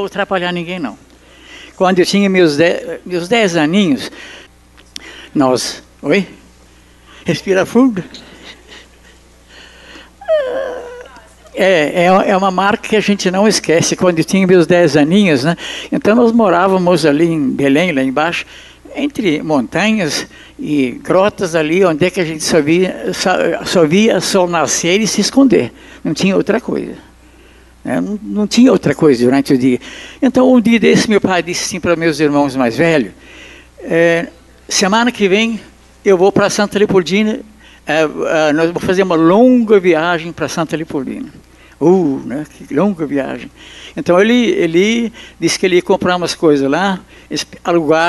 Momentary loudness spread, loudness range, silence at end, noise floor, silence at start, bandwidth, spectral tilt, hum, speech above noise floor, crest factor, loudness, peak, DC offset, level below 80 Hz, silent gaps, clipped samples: 14 LU; 6 LU; 0 s; -44 dBFS; 0 s; 12.5 kHz; -5 dB/octave; 60 Hz at -45 dBFS; 31 dB; 14 dB; -13 LUFS; 0 dBFS; under 0.1%; -46 dBFS; none; under 0.1%